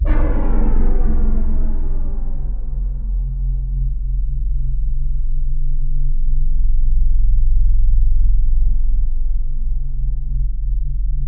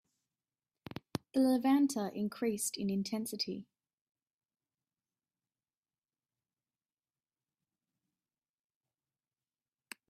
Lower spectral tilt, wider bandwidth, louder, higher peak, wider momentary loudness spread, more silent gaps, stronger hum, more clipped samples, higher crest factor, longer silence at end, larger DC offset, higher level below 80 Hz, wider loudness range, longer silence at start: first, -11 dB/octave vs -4.5 dB/octave; second, 2.1 kHz vs 15.5 kHz; first, -23 LUFS vs -34 LUFS; first, -4 dBFS vs -16 dBFS; second, 6 LU vs 17 LU; neither; neither; neither; second, 10 dB vs 24 dB; second, 0 s vs 6.45 s; neither; first, -14 dBFS vs -78 dBFS; second, 4 LU vs 12 LU; second, 0 s vs 1.35 s